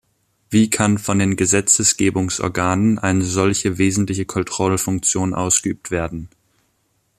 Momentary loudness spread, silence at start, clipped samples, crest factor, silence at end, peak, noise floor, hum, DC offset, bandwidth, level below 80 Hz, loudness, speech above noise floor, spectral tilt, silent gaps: 9 LU; 0.5 s; under 0.1%; 18 dB; 0.9 s; 0 dBFS; -65 dBFS; none; under 0.1%; 14.5 kHz; -48 dBFS; -18 LUFS; 47 dB; -4 dB/octave; none